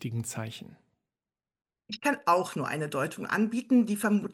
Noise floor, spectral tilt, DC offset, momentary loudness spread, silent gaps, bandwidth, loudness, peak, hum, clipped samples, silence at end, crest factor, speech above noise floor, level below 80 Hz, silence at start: under -90 dBFS; -5.5 dB/octave; under 0.1%; 13 LU; none; 16 kHz; -29 LUFS; -12 dBFS; none; under 0.1%; 0 s; 18 dB; over 61 dB; -74 dBFS; 0 s